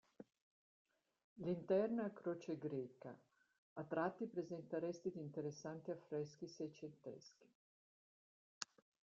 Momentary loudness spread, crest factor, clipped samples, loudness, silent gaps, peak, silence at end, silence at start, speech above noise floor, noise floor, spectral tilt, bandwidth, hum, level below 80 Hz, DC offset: 18 LU; 26 dB; under 0.1%; -47 LUFS; 0.41-0.85 s, 1.24-1.36 s, 3.58-3.76 s, 7.55-8.61 s; -20 dBFS; 0.45 s; 0.2 s; over 44 dB; under -90 dBFS; -6 dB/octave; 7.6 kHz; none; -88 dBFS; under 0.1%